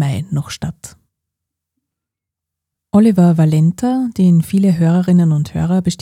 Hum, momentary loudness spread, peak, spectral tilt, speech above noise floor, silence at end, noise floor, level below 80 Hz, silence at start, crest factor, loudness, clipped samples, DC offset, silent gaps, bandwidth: none; 10 LU; 0 dBFS; -8 dB/octave; 70 dB; 0.05 s; -83 dBFS; -46 dBFS; 0 s; 14 dB; -14 LUFS; under 0.1%; under 0.1%; none; 14 kHz